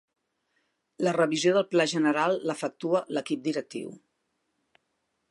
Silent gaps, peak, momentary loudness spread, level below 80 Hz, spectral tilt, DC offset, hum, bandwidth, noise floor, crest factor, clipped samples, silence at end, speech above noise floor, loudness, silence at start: none; -10 dBFS; 10 LU; -82 dBFS; -4.5 dB/octave; under 0.1%; none; 11.5 kHz; -78 dBFS; 18 dB; under 0.1%; 1.35 s; 51 dB; -27 LUFS; 1 s